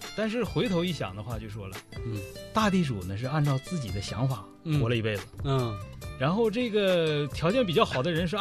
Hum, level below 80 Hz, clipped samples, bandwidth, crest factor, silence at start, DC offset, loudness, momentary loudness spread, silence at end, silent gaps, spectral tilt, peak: none; -48 dBFS; under 0.1%; 13.5 kHz; 20 dB; 0 s; under 0.1%; -28 LUFS; 12 LU; 0 s; none; -6 dB/octave; -8 dBFS